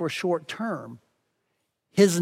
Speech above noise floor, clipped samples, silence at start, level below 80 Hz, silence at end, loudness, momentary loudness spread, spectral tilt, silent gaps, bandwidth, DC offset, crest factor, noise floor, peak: 53 dB; under 0.1%; 0 s; -74 dBFS; 0 s; -27 LUFS; 14 LU; -5 dB/octave; none; 16.5 kHz; under 0.1%; 20 dB; -77 dBFS; -6 dBFS